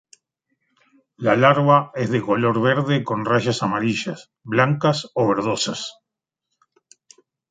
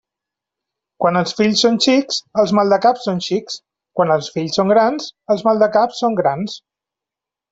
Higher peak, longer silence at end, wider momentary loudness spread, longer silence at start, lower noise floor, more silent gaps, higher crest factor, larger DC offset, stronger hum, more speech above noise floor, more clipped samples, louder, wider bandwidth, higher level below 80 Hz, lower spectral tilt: about the same, -2 dBFS vs -2 dBFS; first, 1.6 s vs 0.95 s; about the same, 10 LU vs 12 LU; first, 1.2 s vs 1 s; second, -83 dBFS vs -87 dBFS; neither; about the same, 20 dB vs 16 dB; neither; neither; second, 64 dB vs 71 dB; neither; second, -20 LUFS vs -16 LUFS; first, 9.4 kHz vs 8 kHz; about the same, -62 dBFS vs -60 dBFS; about the same, -5.5 dB/octave vs -4.5 dB/octave